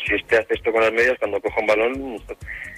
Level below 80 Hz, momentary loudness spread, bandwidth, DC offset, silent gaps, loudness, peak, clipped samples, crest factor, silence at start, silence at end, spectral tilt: -46 dBFS; 14 LU; 14.5 kHz; under 0.1%; none; -20 LUFS; -6 dBFS; under 0.1%; 14 dB; 0 s; 0 s; -4.5 dB/octave